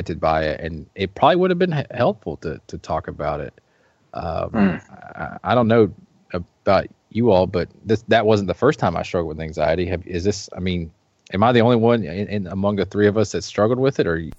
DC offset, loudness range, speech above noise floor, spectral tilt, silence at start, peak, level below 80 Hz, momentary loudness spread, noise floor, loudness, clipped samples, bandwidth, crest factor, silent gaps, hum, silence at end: under 0.1%; 5 LU; 40 dB; -6.5 dB/octave; 0 s; -2 dBFS; -44 dBFS; 14 LU; -60 dBFS; -20 LUFS; under 0.1%; 8 kHz; 18 dB; none; none; 0.05 s